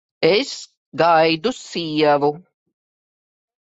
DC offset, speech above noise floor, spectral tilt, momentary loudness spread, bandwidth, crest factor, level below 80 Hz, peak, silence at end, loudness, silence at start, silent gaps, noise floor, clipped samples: under 0.1%; over 72 dB; -4.5 dB/octave; 16 LU; 8 kHz; 18 dB; -64 dBFS; -2 dBFS; 1.2 s; -18 LUFS; 0.2 s; 0.77-0.92 s; under -90 dBFS; under 0.1%